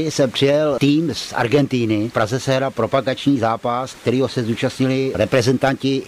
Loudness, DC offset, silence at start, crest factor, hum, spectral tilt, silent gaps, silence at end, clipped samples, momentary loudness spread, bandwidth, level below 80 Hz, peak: -18 LUFS; under 0.1%; 0 s; 12 dB; none; -6 dB/octave; none; 0 s; under 0.1%; 5 LU; 15.5 kHz; -52 dBFS; -6 dBFS